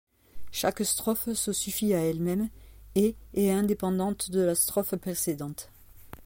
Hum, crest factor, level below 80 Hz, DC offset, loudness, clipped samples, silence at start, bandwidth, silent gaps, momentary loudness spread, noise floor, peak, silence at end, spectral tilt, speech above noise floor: none; 18 dB; -52 dBFS; under 0.1%; -28 LUFS; under 0.1%; 0.35 s; 17 kHz; none; 9 LU; -48 dBFS; -12 dBFS; 0 s; -4.5 dB/octave; 20 dB